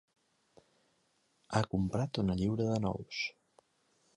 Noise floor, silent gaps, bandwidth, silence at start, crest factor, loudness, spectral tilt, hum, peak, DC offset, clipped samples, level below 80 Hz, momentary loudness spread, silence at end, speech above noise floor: -75 dBFS; none; 11 kHz; 1.5 s; 22 dB; -34 LUFS; -6.5 dB/octave; none; -14 dBFS; under 0.1%; under 0.1%; -56 dBFS; 6 LU; 0.85 s; 42 dB